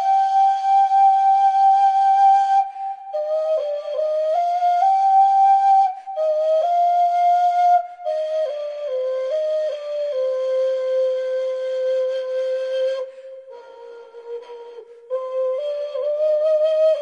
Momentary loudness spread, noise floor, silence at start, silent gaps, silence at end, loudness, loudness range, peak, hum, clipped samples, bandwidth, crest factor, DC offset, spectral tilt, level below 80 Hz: 13 LU; -40 dBFS; 0 s; none; 0 s; -19 LUFS; 10 LU; -8 dBFS; none; under 0.1%; 7.6 kHz; 12 dB; under 0.1%; 0.5 dB/octave; -80 dBFS